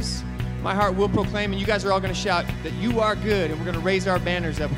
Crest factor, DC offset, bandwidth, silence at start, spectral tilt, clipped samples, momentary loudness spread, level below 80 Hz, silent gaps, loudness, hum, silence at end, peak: 18 dB; under 0.1%; 16 kHz; 0 s; -5.5 dB/octave; under 0.1%; 6 LU; -36 dBFS; none; -24 LUFS; none; 0 s; -6 dBFS